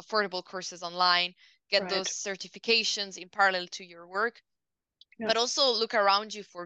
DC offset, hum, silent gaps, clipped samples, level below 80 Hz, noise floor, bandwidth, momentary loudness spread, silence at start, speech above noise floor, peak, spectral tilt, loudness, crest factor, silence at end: under 0.1%; none; none; under 0.1%; -84 dBFS; -87 dBFS; 9 kHz; 12 LU; 0.1 s; 58 dB; -10 dBFS; -1 dB/octave; -28 LUFS; 20 dB; 0 s